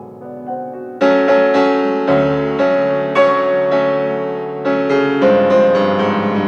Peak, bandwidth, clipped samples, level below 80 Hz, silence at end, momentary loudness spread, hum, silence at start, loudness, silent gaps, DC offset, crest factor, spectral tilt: -2 dBFS; 7 kHz; under 0.1%; -54 dBFS; 0 s; 14 LU; none; 0 s; -14 LUFS; none; under 0.1%; 12 dB; -7 dB/octave